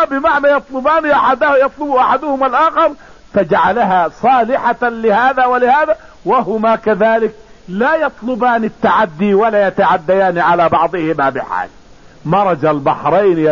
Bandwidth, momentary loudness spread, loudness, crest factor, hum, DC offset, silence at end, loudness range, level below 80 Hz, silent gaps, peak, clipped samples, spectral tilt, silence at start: 7.2 kHz; 5 LU; -13 LUFS; 10 dB; none; 0.5%; 0 s; 1 LU; -46 dBFS; none; -2 dBFS; under 0.1%; -7 dB/octave; 0 s